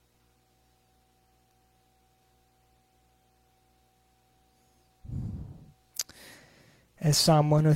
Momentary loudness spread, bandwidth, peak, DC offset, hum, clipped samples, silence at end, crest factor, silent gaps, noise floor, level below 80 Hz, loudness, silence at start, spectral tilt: 29 LU; 16.5 kHz; -10 dBFS; under 0.1%; 60 Hz at -70 dBFS; under 0.1%; 0 s; 22 dB; none; -67 dBFS; -56 dBFS; -27 LUFS; 5.05 s; -5 dB/octave